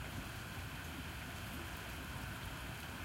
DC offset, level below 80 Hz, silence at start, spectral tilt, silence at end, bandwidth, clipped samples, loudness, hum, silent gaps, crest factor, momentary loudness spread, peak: under 0.1%; -54 dBFS; 0 s; -4 dB/octave; 0 s; 16 kHz; under 0.1%; -46 LUFS; none; none; 12 dB; 1 LU; -34 dBFS